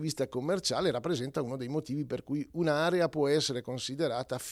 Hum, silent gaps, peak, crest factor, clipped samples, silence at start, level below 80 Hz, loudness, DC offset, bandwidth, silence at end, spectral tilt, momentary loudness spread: none; none; -14 dBFS; 16 dB; under 0.1%; 0 s; -64 dBFS; -32 LUFS; under 0.1%; 16 kHz; 0 s; -5 dB/octave; 8 LU